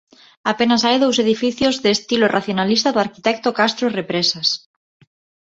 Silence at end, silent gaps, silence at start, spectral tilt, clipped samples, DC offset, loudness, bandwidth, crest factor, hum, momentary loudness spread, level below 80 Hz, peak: 0.85 s; none; 0.45 s; -3.5 dB/octave; under 0.1%; under 0.1%; -17 LUFS; 8 kHz; 16 dB; none; 5 LU; -58 dBFS; -2 dBFS